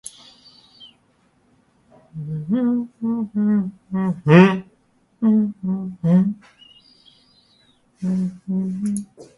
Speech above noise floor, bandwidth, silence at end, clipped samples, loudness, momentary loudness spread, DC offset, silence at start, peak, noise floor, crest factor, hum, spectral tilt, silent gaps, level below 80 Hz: 42 dB; 11.5 kHz; 0.15 s; under 0.1%; -20 LUFS; 15 LU; under 0.1%; 0.8 s; 0 dBFS; -61 dBFS; 22 dB; none; -8 dB/octave; none; -60 dBFS